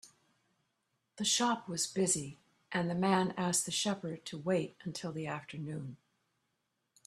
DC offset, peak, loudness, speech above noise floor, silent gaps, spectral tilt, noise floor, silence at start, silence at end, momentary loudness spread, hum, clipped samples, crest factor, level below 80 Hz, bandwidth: under 0.1%; -14 dBFS; -34 LUFS; 48 dB; none; -3.5 dB/octave; -83 dBFS; 0.05 s; 1.1 s; 12 LU; none; under 0.1%; 22 dB; -74 dBFS; 13.5 kHz